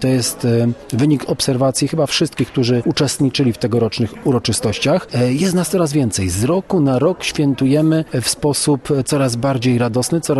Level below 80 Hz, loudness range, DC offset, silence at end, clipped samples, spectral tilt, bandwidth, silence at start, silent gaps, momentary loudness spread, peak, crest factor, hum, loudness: -46 dBFS; 1 LU; under 0.1%; 0 s; under 0.1%; -5 dB/octave; 13 kHz; 0 s; none; 3 LU; -4 dBFS; 12 dB; none; -16 LUFS